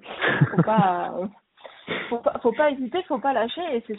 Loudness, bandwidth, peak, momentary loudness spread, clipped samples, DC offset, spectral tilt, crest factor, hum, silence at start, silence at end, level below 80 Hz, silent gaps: -24 LUFS; 4.1 kHz; -4 dBFS; 12 LU; under 0.1%; under 0.1%; -5 dB/octave; 20 dB; none; 0.05 s; 0 s; -62 dBFS; none